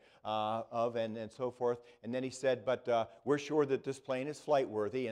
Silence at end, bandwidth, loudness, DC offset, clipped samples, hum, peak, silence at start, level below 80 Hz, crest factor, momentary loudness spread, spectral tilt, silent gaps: 0 s; 11.5 kHz; -36 LUFS; under 0.1%; under 0.1%; none; -18 dBFS; 0.25 s; -78 dBFS; 16 dB; 7 LU; -5.5 dB/octave; none